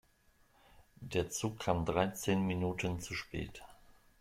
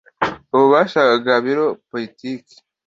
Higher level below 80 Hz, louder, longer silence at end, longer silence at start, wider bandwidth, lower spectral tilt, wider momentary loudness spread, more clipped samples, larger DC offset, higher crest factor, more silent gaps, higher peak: about the same, -58 dBFS vs -58 dBFS; second, -36 LUFS vs -17 LUFS; about the same, 0.45 s vs 0.5 s; first, 1 s vs 0.2 s; first, 16 kHz vs 7.6 kHz; about the same, -5 dB/octave vs -6 dB/octave; second, 11 LU vs 16 LU; neither; neither; first, 22 dB vs 16 dB; neither; second, -16 dBFS vs -2 dBFS